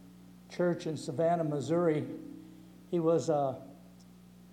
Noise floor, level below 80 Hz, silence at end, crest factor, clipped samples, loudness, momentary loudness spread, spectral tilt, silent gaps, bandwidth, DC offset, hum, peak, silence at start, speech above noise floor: -55 dBFS; -70 dBFS; 0.05 s; 16 dB; under 0.1%; -32 LUFS; 19 LU; -7 dB/octave; none; 15.5 kHz; under 0.1%; 60 Hz at -60 dBFS; -16 dBFS; 0 s; 24 dB